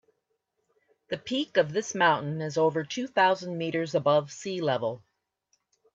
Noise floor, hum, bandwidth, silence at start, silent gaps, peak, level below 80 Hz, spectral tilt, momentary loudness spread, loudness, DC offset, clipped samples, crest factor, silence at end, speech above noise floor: -78 dBFS; none; 8 kHz; 1.1 s; none; -10 dBFS; -74 dBFS; -4.5 dB/octave; 10 LU; -27 LUFS; under 0.1%; under 0.1%; 20 dB; 0.95 s; 51 dB